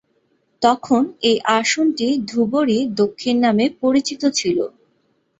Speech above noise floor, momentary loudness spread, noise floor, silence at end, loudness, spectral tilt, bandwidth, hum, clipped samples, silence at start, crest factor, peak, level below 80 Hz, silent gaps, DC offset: 47 dB; 4 LU; -64 dBFS; 0.7 s; -18 LUFS; -4 dB/octave; 8.2 kHz; none; under 0.1%; 0.6 s; 18 dB; -2 dBFS; -60 dBFS; none; under 0.1%